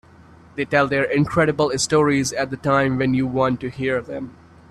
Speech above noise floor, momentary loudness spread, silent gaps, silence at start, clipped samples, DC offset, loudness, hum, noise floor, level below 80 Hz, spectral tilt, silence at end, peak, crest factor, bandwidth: 27 dB; 11 LU; none; 0.55 s; under 0.1%; under 0.1%; -20 LUFS; none; -47 dBFS; -50 dBFS; -5 dB/octave; 0.4 s; -2 dBFS; 18 dB; 13.5 kHz